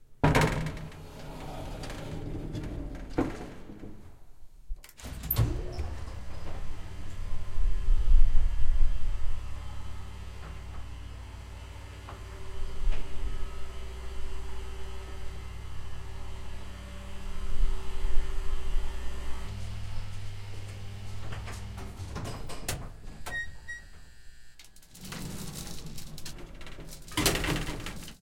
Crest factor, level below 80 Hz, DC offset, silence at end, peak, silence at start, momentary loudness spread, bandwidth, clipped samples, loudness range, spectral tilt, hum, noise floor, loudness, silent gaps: 20 dB; -32 dBFS; under 0.1%; 0.05 s; -6 dBFS; 0 s; 16 LU; 16 kHz; under 0.1%; 9 LU; -4.5 dB/octave; none; -50 dBFS; -37 LUFS; none